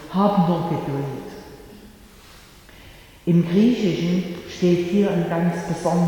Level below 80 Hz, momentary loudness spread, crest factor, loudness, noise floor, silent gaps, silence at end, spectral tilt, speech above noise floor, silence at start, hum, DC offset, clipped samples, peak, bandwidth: -50 dBFS; 13 LU; 16 dB; -21 LUFS; -46 dBFS; none; 0 s; -7.5 dB/octave; 26 dB; 0 s; none; under 0.1%; under 0.1%; -6 dBFS; 17.5 kHz